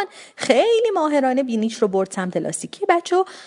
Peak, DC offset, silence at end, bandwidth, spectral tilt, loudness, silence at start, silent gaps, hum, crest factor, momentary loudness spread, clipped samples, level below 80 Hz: 0 dBFS; under 0.1%; 0 s; 11 kHz; -4.5 dB/octave; -20 LUFS; 0 s; none; none; 20 dB; 8 LU; under 0.1%; -72 dBFS